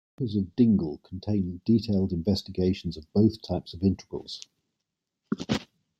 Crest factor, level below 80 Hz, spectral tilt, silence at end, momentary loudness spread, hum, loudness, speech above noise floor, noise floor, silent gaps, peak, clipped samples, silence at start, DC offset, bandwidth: 18 dB; -56 dBFS; -7.5 dB/octave; 0.35 s; 13 LU; none; -28 LUFS; 58 dB; -84 dBFS; none; -10 dBFS; under 0.1%; 0.2 s; under 0.1%; 8.8 kHz